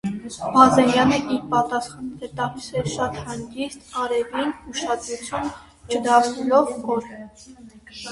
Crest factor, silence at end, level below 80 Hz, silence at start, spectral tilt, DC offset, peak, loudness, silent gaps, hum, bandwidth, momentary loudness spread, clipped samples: 22 dB; 0 s; -52 dBFS; 0.05 s; -4.5 dB/octave; under 0.1%; 0 dBFS; -22 LUFS; none; none; 11.5 kHz; 17 LU; under 0.1%